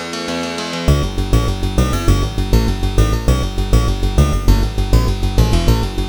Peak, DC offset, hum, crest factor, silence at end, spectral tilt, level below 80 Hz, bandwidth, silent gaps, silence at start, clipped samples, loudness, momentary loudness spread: 0 dBFS; 1%; none; 14 dB; 0 s; -6 dB/octave; -16 dBFS; over 20 kHz; none; 0 s; under 0.1%; -17 LUFS; 3 LU